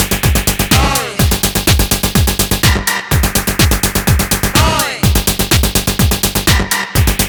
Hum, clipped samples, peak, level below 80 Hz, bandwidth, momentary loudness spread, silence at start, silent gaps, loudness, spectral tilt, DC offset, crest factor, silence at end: none; under 0.1%; 0 dBFS; -20 dBFS; over 20 kHz; 2 LU; 0 s; none; -12 LUFS; -3.5 dB/octave; under 0.1%; 12 dB; 0 s